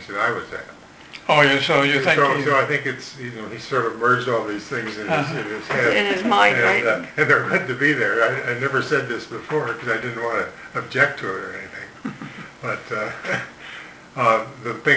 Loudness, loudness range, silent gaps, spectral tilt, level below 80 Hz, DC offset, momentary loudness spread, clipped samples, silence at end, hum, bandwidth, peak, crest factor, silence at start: -20 LUFS; 7 LU; none; -5 dB/octave; -60 dBFS; under 0.1%; 17 LU; under 0.1%; 0 s; none; 8 kHz; 0 dBFS; 22 dB; 0 s